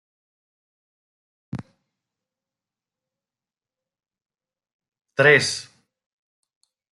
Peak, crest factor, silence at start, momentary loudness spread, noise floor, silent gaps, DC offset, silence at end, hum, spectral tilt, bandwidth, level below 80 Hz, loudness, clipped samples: -2 dBFS; 26 dB; 1.55 s; 22 LU; under -90 dBFS; 4.73-4.79 s; under 0.1%; 1.35 s; none; -3.5 dB/octave; 11.5 kHz; -70 dBFS; -17 LUFS; under 0.1%